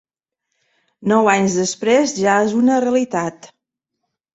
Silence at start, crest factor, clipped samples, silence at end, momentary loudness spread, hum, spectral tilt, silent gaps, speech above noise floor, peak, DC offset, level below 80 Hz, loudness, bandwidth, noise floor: 1 s; 16 dB; under 0.1%; 0.9 s; 8 LU; none; -4.5 dB/octave; none; 62 dB; -2 dBFS; under 0.1%; -62 dBFS; -17 LUFS; 8.2 kHz; -78 dBFS